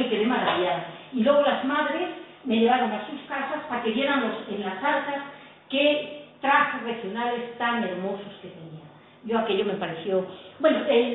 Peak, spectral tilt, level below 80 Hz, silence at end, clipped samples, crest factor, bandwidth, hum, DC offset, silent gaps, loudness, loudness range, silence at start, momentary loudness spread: -8 dBFS; -9 dB/octave; -70 dBFS; 0 s; under 0.1%; 18 dB; 4.1 kHz; none; under 0.1%; none; -25 LUFS; 4 LU; 0 s; 15 LU